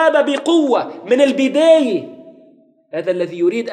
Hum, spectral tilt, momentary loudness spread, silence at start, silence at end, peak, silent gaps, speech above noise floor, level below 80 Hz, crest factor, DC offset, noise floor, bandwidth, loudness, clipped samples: none; -4.5 dB/octave; 12 LU; 0 s; 0 s; -2 dBFS; none; 35 dB; -78 dBFS; 14 dB; under 0.1%; -50 dBFS; 10 kHz; -15 LUFS; under 0.1%